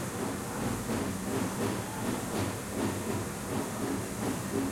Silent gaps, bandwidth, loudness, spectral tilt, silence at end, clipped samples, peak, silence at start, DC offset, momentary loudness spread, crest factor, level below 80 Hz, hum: none; 16.5 kHz; -34 LUFS; -5 dB/octave; 0 s; under 0.1%; -18 dBFS; 0 s; under 0.1%; 2 LU; 16 dB; -54 dBFS; none